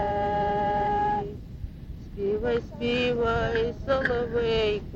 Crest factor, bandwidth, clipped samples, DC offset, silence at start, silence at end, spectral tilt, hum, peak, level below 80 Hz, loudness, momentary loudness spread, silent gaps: 16 dB; 7.6 kHz; under 0.1%; under 0.1%; 0 s; 0 s; -6.5 dB/octave; none; -10 dBFS; -40 dBFS; -26 LUFS; 15 LU; none